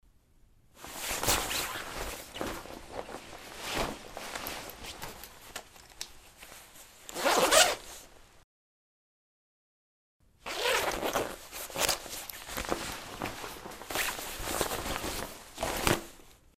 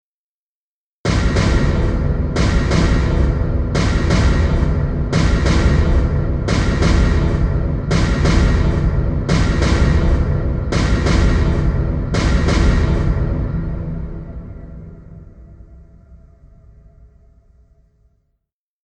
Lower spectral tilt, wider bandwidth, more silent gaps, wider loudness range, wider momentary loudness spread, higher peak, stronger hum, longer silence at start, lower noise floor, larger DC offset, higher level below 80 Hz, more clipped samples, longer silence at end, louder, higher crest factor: second, -1.5 dB/octave vs -6.5 dB/octave; first, 15.5 kHz vs 9.6 kHz; first, 8.44-10.20 s vs none; first, 10 LU vs 6 LU; first, 18 LU vs 8 LU; about the same, -2 dBFS vs -2 dBFS; neither; second, 0.75 s vs 1.05 s; second, -62 dBFS vs under -90 dBFS; neither; second, -50 dBFS vs -20 dBFS; neither; second, 0.25 s vs 2.7 s; second, -32 LUFS vs -17 LUFS; first, 32 dB vs 14 dB